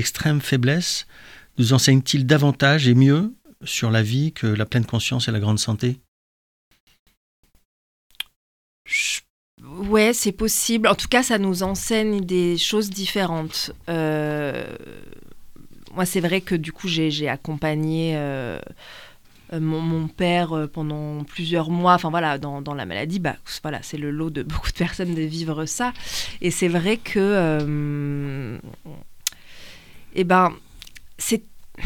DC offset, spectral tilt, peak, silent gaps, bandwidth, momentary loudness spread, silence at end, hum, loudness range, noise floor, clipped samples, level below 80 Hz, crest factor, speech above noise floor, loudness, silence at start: under 0.1%; -5 dB/octave; -2 dBFS; 6.08-6.71 s, 6.80-6.87 s, 6.99-7.06 s, 7.17-7.43 s, 7.65-8.10 s, 8.36-8.85 s, 9.30-9.58 s; 19 kHz; 13 LU; 0 s; none; 8 LU; -41 dBFS; under 0.1%; -44 dBFS; 20 dB; 20 dB; -22 LUFS; 0 s